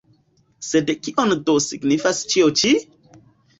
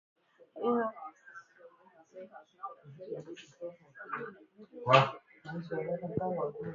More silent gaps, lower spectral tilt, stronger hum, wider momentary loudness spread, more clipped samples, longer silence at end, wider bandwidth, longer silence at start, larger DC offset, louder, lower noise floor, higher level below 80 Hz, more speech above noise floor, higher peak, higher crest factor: neither; about the same, -3.5 dB/octave vs -4 dB/octave; neither; second, 6 LU vs 27 LU; neither; first, 0.75 s vs 0 s; first, 8.2 kHz vs 7.2 kHz; about the same, 0.6 s vs 0.55 s; neither; first, -19 LUFS vs -33 LUFS; about the same, -60 dBFS vs -61 dBFS; first, -60 dBFS vs -74 dBFS; first, 41 dB vs 26 dB; first, -4 dBFS vs -8 dBFS; second, 16 dB vs 28 dB